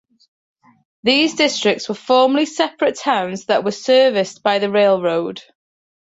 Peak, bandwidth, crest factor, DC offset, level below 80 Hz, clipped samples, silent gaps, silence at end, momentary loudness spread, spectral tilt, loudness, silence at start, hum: -2 dBFS; 8 kHz; 16 dB; under 0.1%; -66 dBFS; under 0.1%; none; 0.7 s; 7 LU; -3.5 dB/octave; -17 LUFS; 1.05 s; none